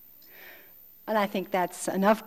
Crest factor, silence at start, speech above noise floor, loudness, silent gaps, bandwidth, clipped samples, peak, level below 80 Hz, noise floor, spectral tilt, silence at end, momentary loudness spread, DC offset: 20 dB; 0.35 s; 27 dB; -28 LUFS; none; 19.5 kHz; under 0.1%; -10 dBFS; -70 dBFS; -53 dBFS; -5 dB/octave; 0 s; 23 LU; 0.1%